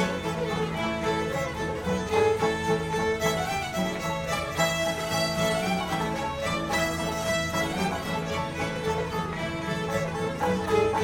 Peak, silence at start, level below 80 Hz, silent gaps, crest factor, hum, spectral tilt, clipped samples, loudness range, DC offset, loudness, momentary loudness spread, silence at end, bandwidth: -12 dBFS; 0 s; -48 dBFS; none; 16 dB; none; -4.5 dB/octave; under 0.1%; 2 LU; under 0.1%; -27 LUFS; 5 LU; 0 s; 17 kHz